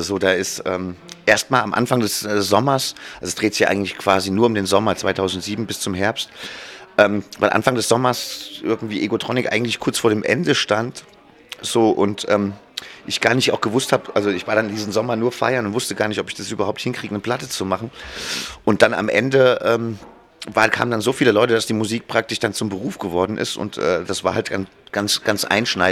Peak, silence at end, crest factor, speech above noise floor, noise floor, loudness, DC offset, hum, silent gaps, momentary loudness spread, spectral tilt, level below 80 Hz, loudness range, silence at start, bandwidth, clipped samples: 0 dBFS; 0 s; 20 dB; 21 dB; -40 dBFS; -19 LUFS; under 0.1%; none; none; 10 LU; -4 dB/octave; -56 dBFS; 3 LU; 0 s; 16.5 kHz; under 0.1%